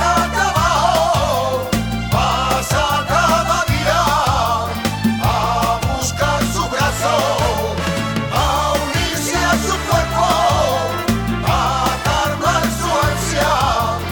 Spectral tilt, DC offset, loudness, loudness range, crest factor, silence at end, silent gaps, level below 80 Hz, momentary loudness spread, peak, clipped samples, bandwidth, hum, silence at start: -4 dB/octave; 0.2%; -17 LUFS; 1 LU; 12 dB; 0 s; none; -28 dBFS; 4 LU; -4 dBFS; under 0.1%; over 20 kHz; none; 0 s